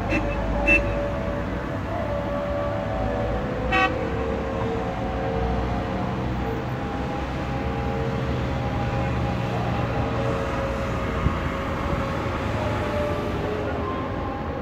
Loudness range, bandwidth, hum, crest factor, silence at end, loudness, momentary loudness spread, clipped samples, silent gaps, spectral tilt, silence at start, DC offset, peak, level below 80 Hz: 2 LU; 15 kHz; none; 18 dB; 0 s; -26 LUFS; 5 LU; under 0.1%; none; -7 dB/octave; 0 s; under 0.1%; -6 dBFS; -34 dBFS